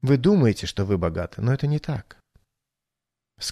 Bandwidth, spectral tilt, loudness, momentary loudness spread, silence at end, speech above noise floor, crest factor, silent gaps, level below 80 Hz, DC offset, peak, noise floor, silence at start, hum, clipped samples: 13.5 kHz; -7 dB/octave; -23 LUFS; 13 LU; 0 s; 64 dB; 18 dB; none; -46 dBFS; under 0.1%; -6 dBFS; -86 dBFS; 0.05 s; none; under 0.1%